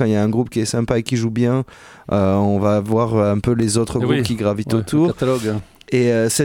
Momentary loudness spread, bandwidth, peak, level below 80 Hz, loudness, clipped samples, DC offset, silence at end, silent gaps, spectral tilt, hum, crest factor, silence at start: 6 LU; 17 kHz; -2 dBFS; -44 dBFS; -18 LUFS; under 0.1%; under 0.1%; 0 s; none; -6 dB/octave; none; 14 dB; 0 s